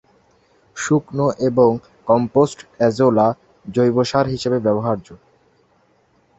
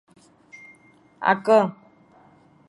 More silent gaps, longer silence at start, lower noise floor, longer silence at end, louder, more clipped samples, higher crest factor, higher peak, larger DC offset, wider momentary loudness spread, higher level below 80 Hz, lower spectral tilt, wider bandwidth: neither; second, 0.75 s vs 1.2 s; first, -59 dBFS vs -55 dBFS; first, 1.25 s vs 0.95 s; first, -18 LUFS vs -21 LUFS; neither; about the same, 18 dB vs 22 dB; about the same, -2 dBFS vs -4 dBFS; neither; second, 11 LU vs 27 LU; first, -54 dBFS vs -74 dBFS; about the same, -6.5 dB/octave vs -6.5 dB/octave; second, 8.2 kHz vs 11.5 kHz